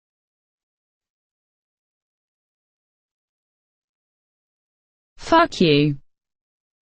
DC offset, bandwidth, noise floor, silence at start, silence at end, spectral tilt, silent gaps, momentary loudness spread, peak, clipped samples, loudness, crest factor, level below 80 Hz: under 0.1%; 9 kHz; under -90 dBFS; 5.2 s; 0.95 s; -6 dB/octave; none; 18 LU; -2 dBFS; under 0.1%; -18 LUFS; 24 dB; -54 dBFS